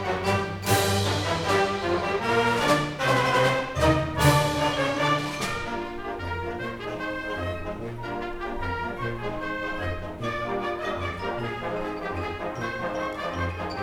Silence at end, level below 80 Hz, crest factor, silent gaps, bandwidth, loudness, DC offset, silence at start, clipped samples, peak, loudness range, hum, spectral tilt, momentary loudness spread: 0 s; -44 dBFS; 20 dB; none; 19 kHz; -26 LUFS; under 0.1%; 0 s; under 0.1%; -6 dBFS; 9 LU; none; -4.5 dB/octave; 10 LU